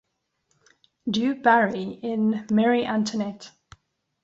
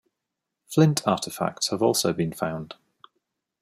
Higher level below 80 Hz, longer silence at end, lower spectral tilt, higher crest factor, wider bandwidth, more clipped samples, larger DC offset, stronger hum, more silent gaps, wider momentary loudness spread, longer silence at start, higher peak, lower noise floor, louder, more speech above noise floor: about the same, -66 dBFS vs -64 dBFS; second, 0.75 s vs 0.9 s; about the same, -5.5 dB/octave vs -5 dB/octave; about the same, 22 dB vs 20 dB; second, 7.8 kHz vs 16 kHz; neither; neither; neither; neither; about the same, 12 LU vs 10 LU; first, 1.05 s vs 0.7 s; about the same, -4 dBFS vs -6 dBFS; second, -73 dBFS vs -84 dBFS; about the same, -23 LUFS vs -24 LUFS; second, 50 dB vs 60 dB